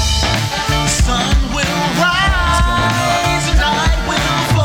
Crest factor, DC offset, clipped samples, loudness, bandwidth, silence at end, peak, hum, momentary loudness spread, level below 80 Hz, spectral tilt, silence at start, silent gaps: 10 dB; under 0.1%; under 0.1%; -14 LUFS; 18 kHz; 0 s; -4 dBFS; none; 3 LU; -20 dBFS; -4 dB/octave; 0 s; none